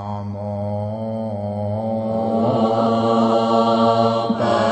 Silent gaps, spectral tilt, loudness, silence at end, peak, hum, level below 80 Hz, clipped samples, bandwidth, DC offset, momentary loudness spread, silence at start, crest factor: none; -7.5 dB/octave; -19 LUFS; 0 s; -4 dBFS; none; -56 dBFS; under 0.1%; 8.6 kHz; under 0.1%; 10 LU; 0 s; 14 dB